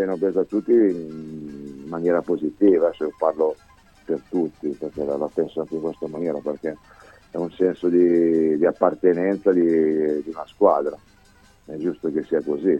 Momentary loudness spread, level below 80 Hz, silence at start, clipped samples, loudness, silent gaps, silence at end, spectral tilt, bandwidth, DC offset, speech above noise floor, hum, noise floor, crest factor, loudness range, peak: 15 LU; -58 dBFS; 0 s; under 0.1%; -22 LUFS; none; 0 s; -9 dB/octave; 8.2 kHz; under 0.1%; 33 dB; none; -54 dBFS; 18 dB; 7 LU; -4 dBFS